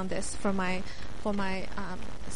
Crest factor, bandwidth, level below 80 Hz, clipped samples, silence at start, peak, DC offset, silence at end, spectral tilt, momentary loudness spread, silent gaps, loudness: 16 dB; 11.5 kHz; -44 dBFS; under 0.1%; 0 s; -18 dBFS; 3%; 0 s; -4.5 dB/octave; 9 LU; none; -34 LUFS